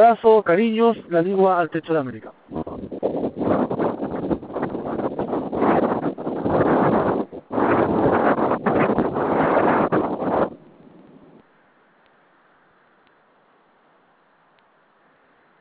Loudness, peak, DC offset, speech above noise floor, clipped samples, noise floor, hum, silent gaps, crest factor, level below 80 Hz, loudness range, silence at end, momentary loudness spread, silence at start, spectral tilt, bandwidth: -21 LUFS; -4 dBFS; under 0.1%; 41 dB; under 0.1%; -59 dBFS; none; none; 18 dB; -50 dBFS; 6 LU; 5.05 s; 10 LU; 0 s; -11 dB/octave; 4 kHz